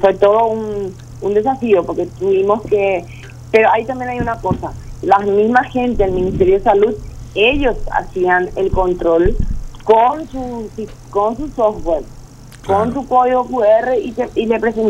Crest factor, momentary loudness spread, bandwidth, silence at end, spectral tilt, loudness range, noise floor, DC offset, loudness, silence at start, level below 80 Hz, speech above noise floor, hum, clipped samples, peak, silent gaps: 14 dB; 13 LU; 10.5 kHz; 0 s; -6.5 dB/octave; 3 LU; -36 dBFS; under 0.1%; -15 LUFS; 0 s; -30 dBFS; 21 dB; none; under 0.1%; 0 dBFS; none